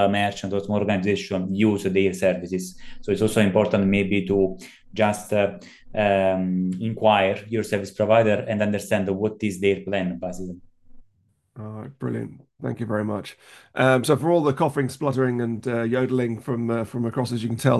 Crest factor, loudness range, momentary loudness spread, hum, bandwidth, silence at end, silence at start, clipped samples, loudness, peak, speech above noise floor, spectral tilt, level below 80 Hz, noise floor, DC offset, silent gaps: 20 dB; 7 LU; 13 LU; none; 12.5 kHz; 0 s; 0 s; under 0.1%; -23 LUFS; -4 dBFS; 43 dB; -6.5 dB/octave; -52 dBFS; -65 dBFS; under 0.1%; none